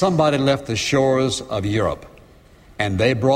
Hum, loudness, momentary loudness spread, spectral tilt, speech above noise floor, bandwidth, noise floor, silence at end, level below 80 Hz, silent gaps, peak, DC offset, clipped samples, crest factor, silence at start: none; -20 LUFS; 7 LU; -5.5 dB/octave; 29 dB; 15.5 kHz; -48 dBFS; 0 s; -46 dBFS; none; -4 dBFS; under 0.1%; under 0.1%; 16 dB; 0 s